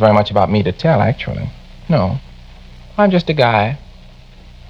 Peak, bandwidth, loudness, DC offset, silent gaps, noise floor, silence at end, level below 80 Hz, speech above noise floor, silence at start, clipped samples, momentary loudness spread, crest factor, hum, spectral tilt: 0 dBFS; 7.4 kHz; -15 LUFS; under 0.1%; none; -39 dBFS; 0.8 s; -38 dBFS; 25 dB; 0 s; under 0.1%; 14 LU; 16 dB; none; -8.5 dB/octave